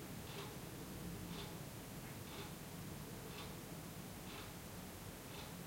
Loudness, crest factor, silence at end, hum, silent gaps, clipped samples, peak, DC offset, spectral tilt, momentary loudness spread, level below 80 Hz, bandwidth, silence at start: -50 LUFS; 16 dB; 0 s; none; none; under 0.1%; -36 dBFS; under 0.1%; -4.5 dB/octave; 2 LU; -64 dBFS; 16.5 kHz; 0 s